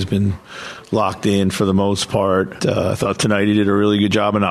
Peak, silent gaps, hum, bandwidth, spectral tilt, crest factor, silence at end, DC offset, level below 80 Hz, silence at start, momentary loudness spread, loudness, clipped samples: -2 dBFS; none; none; 13.5 kHz; -5.5 dB/octave; 14 dB; 0 s; under 0.1%; -48 dBFS; 0 s; 7 LU; -17 LUFS; under 0.1%